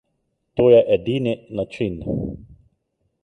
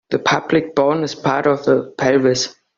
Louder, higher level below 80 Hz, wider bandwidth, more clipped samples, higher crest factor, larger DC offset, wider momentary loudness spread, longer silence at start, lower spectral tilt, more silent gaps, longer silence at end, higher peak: second, -20 LUFS vs -17 LUFS; first, -46 dBFS vs -56 dBFS; first, 8.4 kHz vs 7.6 kHz; neither; about the same, 18 dB vs 16 dB; neither; first, 16 LU vs 4 LU; first, 0.55 s vs 0.1 s; first, -8.5 dB/octave vs -4 dB/octave; neither; first, 0.8 s vs 0.25 s; about the same, -4 dBFS vs -2 dBFS